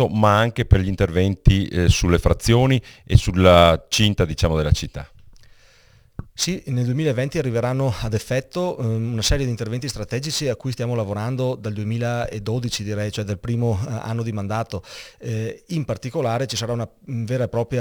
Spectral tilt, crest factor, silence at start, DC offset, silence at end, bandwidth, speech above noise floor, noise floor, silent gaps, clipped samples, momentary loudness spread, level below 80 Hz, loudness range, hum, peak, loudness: -5.5 dB/octave; 20 dB; 0 s; under 0.1%; 0 s; over 20 kHz; 33 dB; -53 dBFS; none; under 0.1%; 11 LU; -32 dBFS; 9 LU; none; 0 dBFS; -21 LUFS